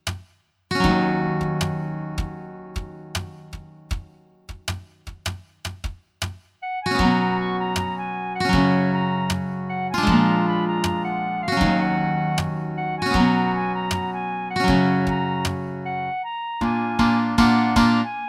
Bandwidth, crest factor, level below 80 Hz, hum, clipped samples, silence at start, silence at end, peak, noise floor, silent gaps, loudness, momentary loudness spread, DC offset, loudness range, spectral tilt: 15.5 kHz; 20 dB; -38 dBFS; none; under 0.1%; 0.05 s; 0 s; -4 dBFS; -54 dBFS; none; -22 LUFS; 16 LU; under 0.1%; 13 LU; -6 dB/octave